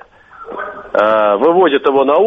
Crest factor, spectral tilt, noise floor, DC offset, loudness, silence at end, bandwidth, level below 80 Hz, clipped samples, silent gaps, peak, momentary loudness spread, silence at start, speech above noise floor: 14 dB; -7 dB/octave; -36 dBFS; under 0.1%; -12 LUFS; 0 s; 5.6 kHz; -54 dBFS; under 0.1%; none; 0 dBFS; 15 LU; 0.4 s; 25 dB